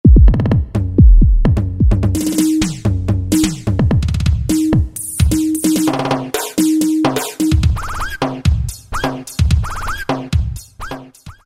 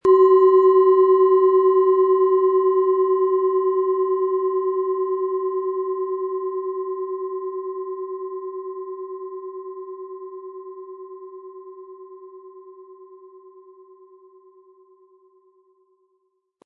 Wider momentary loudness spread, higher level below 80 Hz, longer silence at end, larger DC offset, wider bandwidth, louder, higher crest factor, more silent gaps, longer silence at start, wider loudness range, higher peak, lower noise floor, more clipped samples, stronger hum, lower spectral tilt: second, 10 LU vs 24 LU; first, -18 dBFS vs -72 dBFS; second, 0.15 s vs 3.4 s; neither; first, 16.5 kHz vs 3.1 kHz; first, -16 LUFS vs -19 LUFS; about the same, 14 dB vs 16 dB; neither; about the same, 0.05 s vs 0.05 s; second, 4 LU vs 23 LU; first, 0 dBFS vs -6 dBFS; second, -36 dBFS vs -70 dBFS; neither; neither; second, -6 dB/octave vs -8 dB/octave